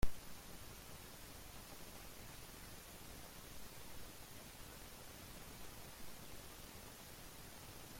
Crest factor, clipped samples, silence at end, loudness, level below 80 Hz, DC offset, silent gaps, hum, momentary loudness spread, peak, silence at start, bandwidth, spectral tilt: 24 dB; under 0.1%; 0 s; -54 LUFS; -56 dBFS; under 0.1%; none; none; 1 LU; -22 dBFS; 0 s; 16.5 kHz; -3.5 dB/octave